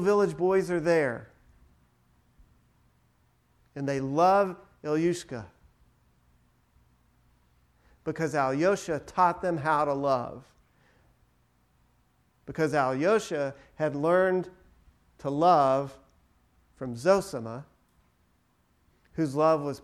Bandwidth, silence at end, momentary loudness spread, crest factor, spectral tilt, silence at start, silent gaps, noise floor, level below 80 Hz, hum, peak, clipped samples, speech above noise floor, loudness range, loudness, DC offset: 13.5 kHz; 0.05 s; 18 LU; 20 dB; -6 dB/octave; 0 s; none; -69 dBFS; -62 dBFS; none; -10 dBFS; under 0.1%; 42 dB; 7 LU; -27 LUFS; under 0.1%